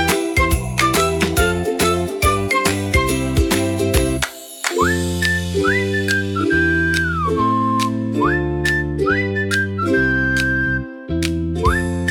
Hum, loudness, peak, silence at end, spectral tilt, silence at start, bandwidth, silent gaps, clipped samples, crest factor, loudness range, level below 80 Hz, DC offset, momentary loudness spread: none; -18 LUFS; 0 dBFS; 0 s; -4.5 dB/octave; 0 s; 18 kHz; none; under 0.1%; 18 dB; 1 LU; -30 dBFS; under 0.1%; 4 LU